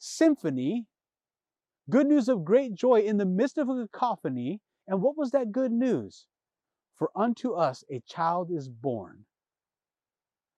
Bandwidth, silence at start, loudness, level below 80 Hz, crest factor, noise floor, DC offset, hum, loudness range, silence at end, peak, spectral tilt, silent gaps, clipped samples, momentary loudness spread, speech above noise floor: 11.5 kHz; 0 s; -27 LUFS; -82 dBFS; 18 dB; under -90 dBFS; under 0.1%; none; 6 LU; 1.45 s; -12 dBFS; -7 dB/octave; none; under 0.1%; 11 LU; over 63 dB